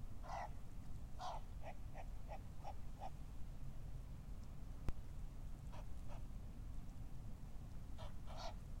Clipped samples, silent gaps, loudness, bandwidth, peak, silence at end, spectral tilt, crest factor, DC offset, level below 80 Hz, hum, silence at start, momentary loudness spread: under 0.1%; none; -54 LUFS; 16 kHz; -28 dBFS; 0 s; -6 dB/octave; 20 dB; under 0.1%; -52 dBFS; none; 0 s; 5 LU